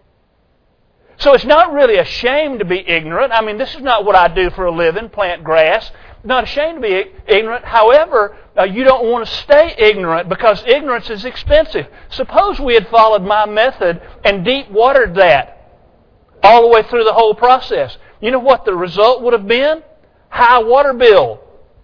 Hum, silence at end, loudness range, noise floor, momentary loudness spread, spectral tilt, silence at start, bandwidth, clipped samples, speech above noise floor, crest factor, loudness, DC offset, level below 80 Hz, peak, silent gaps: none; 0.45 s; 3 LU; -56 dBFS; 10 LU; -6 dB/octave; 1.2 s; 5.4 kHz; 0.5%; 45 dB; 12 dB; -12 LUFS; under 0.1%; -34 dBFS; 0 dBFS; none